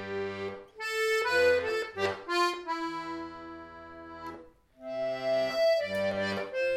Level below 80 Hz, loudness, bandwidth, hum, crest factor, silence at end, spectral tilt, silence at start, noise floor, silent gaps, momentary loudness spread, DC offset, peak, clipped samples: -66 dBFS; -30 LUFS; 15.5 kHz; none; 18 dB; 0 s; -4 dB/octave; 0 s; -52 dBFS; none; 19 LU; under 0.1%; -14 dBFS; under 0.1%